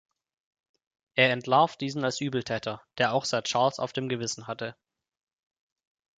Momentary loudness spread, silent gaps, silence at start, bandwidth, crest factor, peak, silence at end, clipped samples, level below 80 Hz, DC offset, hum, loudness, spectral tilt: 11 LU; none; 1.15 s; 9.4 kHz; 24 dB; -6 dBFS; 1.45 s; under 0.1%; -70 dBFS; under 0.1%; none; -27 LUFS; -4 dB/octave